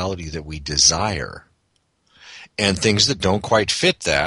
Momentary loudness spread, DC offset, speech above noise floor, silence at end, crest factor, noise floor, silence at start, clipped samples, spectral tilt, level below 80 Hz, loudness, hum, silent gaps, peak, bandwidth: 15 LU; under 0.1%; 47 dB; 0 s; 20 dB; -67 dBFS; 0 s; under 0.1%; -2.5 dB/octave; -40 dBFS; -18 LUFS; none; none; 0 dBFS; 11.5 kHz